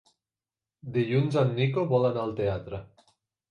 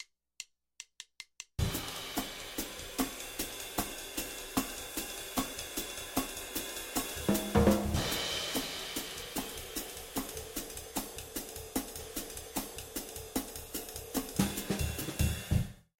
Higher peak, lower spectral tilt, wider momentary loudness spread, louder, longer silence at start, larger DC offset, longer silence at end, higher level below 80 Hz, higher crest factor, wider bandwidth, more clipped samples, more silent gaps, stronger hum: about the same, -12 dBFS vs -12 dBFS; first, -8.5 dB/octave vs -4 dB/octave; first, 15 LU vs 8 LU; first, -27 LUFS vs -36 LUFS; first, 0.85 s vs 0 s; neither; first, 0.65 s vs 0.2 s; second, -56 dBFS vs -46 dBFS; second, 18 dB vs 24 dB; second, 9.8 kHz vs 17 kHz; neither; neither; neither